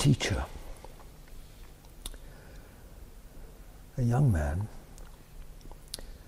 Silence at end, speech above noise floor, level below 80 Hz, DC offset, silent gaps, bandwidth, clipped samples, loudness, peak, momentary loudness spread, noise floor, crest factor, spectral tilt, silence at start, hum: 0 s; 22 dB; -44 dBFS; under 0.1%; none; 16 kHz; under 0.1%; -31 LUFS; -12 dBFS; 26 LU; -49 dBFS; 22 dB; -6 dB/octave; 0 s; none